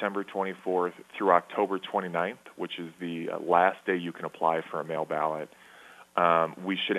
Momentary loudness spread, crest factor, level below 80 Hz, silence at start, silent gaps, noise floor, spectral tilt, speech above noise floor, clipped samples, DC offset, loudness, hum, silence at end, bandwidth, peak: 13 LU; 24 dB; -80 dBFS; 0 s; none; -52 dBFS; -6 dB/octave; 24 dB; under 0.1%; under 0.1%; -29 LUFS; none; 0 s; 13 kHz; -6 dBFS